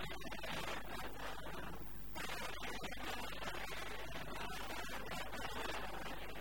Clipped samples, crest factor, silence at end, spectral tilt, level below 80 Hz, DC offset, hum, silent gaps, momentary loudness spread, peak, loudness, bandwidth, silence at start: under 0.1%; 16 dB; 0 s; -3 dB/octave; -56 dBFS; 0.5%; 50 Hz at -55 dBFS; none; 4 LU; -28 dBFS; -46 LUFS; 19.5 kHz; 0 s